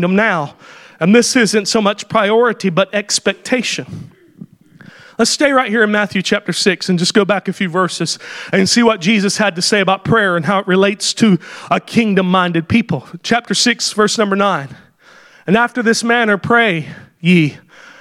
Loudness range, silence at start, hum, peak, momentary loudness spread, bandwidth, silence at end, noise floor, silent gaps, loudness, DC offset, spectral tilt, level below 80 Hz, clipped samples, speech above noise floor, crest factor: 3 LU; 0 s; none; 0 dBFS; 8 LU; 14 kHz; 0.45 s; -45 dBFS; none; -14 LUFS; under 0.1%; -4 dB/octave; -54 dBFS; under 0.1%; 31 dB; 14 dB